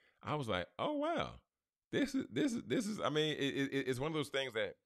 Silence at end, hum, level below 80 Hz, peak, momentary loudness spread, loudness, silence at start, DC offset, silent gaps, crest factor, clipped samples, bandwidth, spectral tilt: 0.15 s; none; -68 dBFS; -22 dBFS; 5 LU; -38 LUFS; 0.25 s; under 0.1%; 1.87-1.91 s; 16 dB; under 0.1%; 13.5 kHz; -5 dB/octave